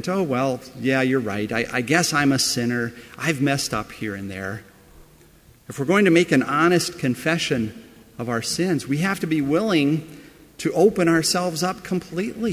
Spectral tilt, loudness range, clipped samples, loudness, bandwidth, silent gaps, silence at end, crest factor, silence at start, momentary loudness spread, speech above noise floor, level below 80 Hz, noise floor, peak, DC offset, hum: -4.5 dB/octave; 3 LU; under 0.1%; -21 LUFS; 16 kHz; none; 0 s; 18 dB; 0 s; 12 LU; 30 dB; -54 dBFS; -52 dBFS; -4 dBFS; under 0.1%; none